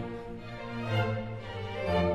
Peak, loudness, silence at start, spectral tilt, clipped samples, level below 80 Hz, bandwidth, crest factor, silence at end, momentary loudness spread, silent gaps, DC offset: -16 dBFS; -34 LUFS; 0 s; -7.5 dB/octave; under 0.1%; -52 dBFS; 10 kHz; 16 dB; 0 s; 11 LU; none; 0.2%